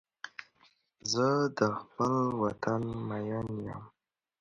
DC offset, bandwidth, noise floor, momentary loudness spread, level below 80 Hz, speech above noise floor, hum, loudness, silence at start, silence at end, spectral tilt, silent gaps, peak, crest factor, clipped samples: under 0.1%; 9.4 kHz; -67 dBFS; 17 LU; -64 dBFS; 36 dB; none; -32 LUFS; 0.25 s; 0.5 s; -5.5 dB/octave; none; -12 dBFS; 22 dB; under 0.1%